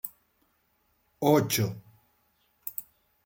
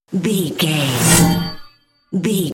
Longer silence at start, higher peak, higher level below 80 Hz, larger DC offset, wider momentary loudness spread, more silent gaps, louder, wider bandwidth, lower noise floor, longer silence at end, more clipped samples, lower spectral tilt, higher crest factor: about the same, 0.05 s vs 0.1 s; second, -10 dBFS vs 0 dBFS; second, -70 dBFS vs -40 dBFS; neither; first, 17 LU vs 11 LU; neither; second, -28 LUFS vs -16 LUFS; about the same, 17 kHz vs 17 kHz; first, -71 dBFS vs -47 dBFS; first, 0.45 s vs 0 s; neither; about the same, -5 dB/octave vs -4 dB/octave; first, 22 dB vs 16 dB